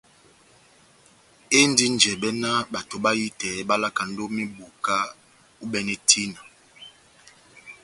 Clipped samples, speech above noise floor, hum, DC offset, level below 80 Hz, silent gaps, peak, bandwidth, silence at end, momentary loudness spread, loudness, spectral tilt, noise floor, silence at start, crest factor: under 0.1%; 32 dB; none; under 0.1%; -64 dBFS; none; 0 dBFS; 11.5 kHz; 0.1 s; 13 LU; -22 LUFS; -2 dB/octave; -56 dBFS; 1.5 s; 26 dB